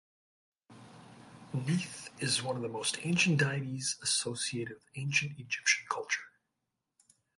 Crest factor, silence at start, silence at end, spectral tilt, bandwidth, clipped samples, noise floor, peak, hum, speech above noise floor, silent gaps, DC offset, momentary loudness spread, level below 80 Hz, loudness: 22 dB; 0.7 s; 1.1 s; -3 dB/octave; 11.5 kHz; under 0.1%; -86 dBFS; -14 dBFS; none; 52 dB; none; under 0.1%; 10 LU; -74 dBFS; -32 LUFS